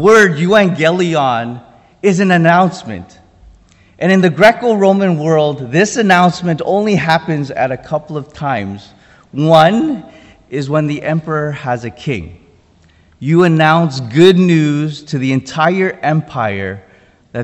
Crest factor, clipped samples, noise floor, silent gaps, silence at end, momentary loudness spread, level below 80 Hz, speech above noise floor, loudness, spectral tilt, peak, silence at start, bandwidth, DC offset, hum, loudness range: 14 dB; 0.5%; -48 dBFS; none; 0 s; 15 LU; -48 dBFS; 36 dB; -13 LUFS; -6 dB/octave; 0 dBFS; 0 s; 10.5 kHz; under 0.1%; none; 4 LU